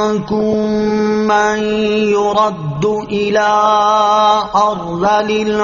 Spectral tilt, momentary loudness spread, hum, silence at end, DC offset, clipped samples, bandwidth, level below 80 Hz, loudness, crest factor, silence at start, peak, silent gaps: -3.5 dB/octave; 6 LU; none; 0 s; under 0.1%; under 0.1%; 7.2 kHz; -44 dBFS; -14 LUFS; 12 dB; 0 s; 0 dBFS; none